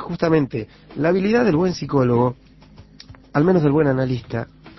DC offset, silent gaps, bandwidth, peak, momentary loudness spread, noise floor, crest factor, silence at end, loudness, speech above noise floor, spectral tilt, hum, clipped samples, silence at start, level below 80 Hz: under 0.1%; none; 6.2 kHz; -4 dBFS; 11 LU; -46 dBFS; 16 dB; 0.1 s; -19 LUFS; 27 dB; -8 dB/octave; none; under 0.1%; 0 s; -48 dBFS